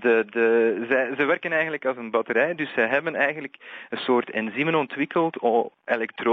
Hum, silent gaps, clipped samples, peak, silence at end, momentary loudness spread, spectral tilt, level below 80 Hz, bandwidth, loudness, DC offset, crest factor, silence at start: none; none; under 0.1%; -8 dBFS; 0 s; 7 LU; -3 dB/octave; -78 dBFS; 5.8 kHz; -23 LUFS; under 0.1%; 16 dB; 0 s